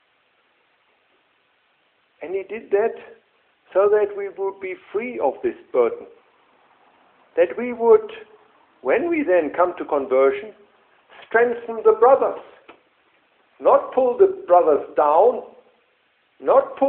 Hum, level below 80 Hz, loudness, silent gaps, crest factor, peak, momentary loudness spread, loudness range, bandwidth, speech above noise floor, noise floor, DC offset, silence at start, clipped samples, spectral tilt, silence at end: none; -66 dBFS; -20 LUFS; none; 18 dB; -2 dBFS; 14 LU; 7 LU; 3.9 kHz; 45 dB; -64 dBFS; under 0.1%; 2.2 s; under 0.1%; -9.5 dB/octave; 0 s